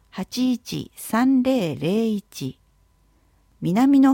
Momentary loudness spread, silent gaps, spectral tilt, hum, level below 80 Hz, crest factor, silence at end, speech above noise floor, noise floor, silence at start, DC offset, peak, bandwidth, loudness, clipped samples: 14 LU; none; -6 dB/octave; none; -58 dBFS; 16 dB; 0 s; 40 dB; -60 dBFS; 0.15 s; under 0.1%; -6 dBFS; 17 kHz; -22 LUFS; under 0.1%